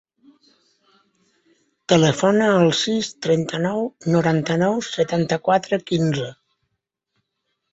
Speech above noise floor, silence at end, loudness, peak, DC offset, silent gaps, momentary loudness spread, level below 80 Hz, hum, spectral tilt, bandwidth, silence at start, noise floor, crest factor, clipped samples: 58 dB; 1.4 s; -20 LUFS; -2 dBFS; under 0.1%; none; 7 LU; -60 dBFS; none; -5.5 dB/octave; 8 kHz; 1.9 s; -77 dBFS; 20 dB; under 0.1%